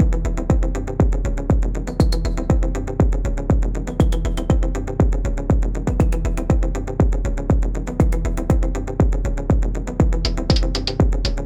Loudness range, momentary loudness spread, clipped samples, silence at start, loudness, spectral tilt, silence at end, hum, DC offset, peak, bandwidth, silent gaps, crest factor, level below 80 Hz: 0 LU; 4 LU; under 0.1%; 0 s; -21 LUFS; -7 dB/octave; 0 s; none; 0.1%; -4 dBFS; 9.4 kHz; none; 14 dB; -20 dBFS